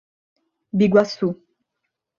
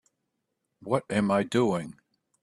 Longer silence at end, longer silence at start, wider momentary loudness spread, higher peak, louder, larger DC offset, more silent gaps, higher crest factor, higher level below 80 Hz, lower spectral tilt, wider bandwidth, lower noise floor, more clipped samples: first, 0.85 s vs 0.5 s; about the same, 0.75 s vs 0.8 s; second, 12 LU vs 16 LU; first, -2 dBFS vs -8 dBFS; first, -20 LUFS vs -27 LUFS; neither; neither; about the same, 20 dB vs 20 dB; about the same, -60 dBFS vs -64 dBFS; about the same, -7.5 dB/octave vs -6.5 dB/octave; second, 7.2 kHz vs 12 kHz; about the same, -79 dBFS vs -81 dBFS; neither